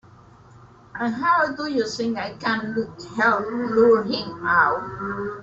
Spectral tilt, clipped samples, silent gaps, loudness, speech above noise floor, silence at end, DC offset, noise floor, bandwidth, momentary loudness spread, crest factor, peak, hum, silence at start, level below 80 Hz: -5 dB/octave; under 0.1%; none; -22 LUFS; 27 dB; 0 s; under 0.1%; -49 dBFS; 7.8 kHz; 11 LU; 18 dB; -4 dBFS; none; 0.6 s; -58 dBFS